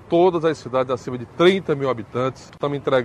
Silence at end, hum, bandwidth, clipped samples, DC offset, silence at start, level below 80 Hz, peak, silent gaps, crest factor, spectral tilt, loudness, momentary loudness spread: 0 s; none; 10 kHz; under 0.1%; under 0.1%; 0.05 s; -56 dBFS; -4 dBFS; none; 16 dB; -6.5 dB/octave; -21 LUFS; 10 LU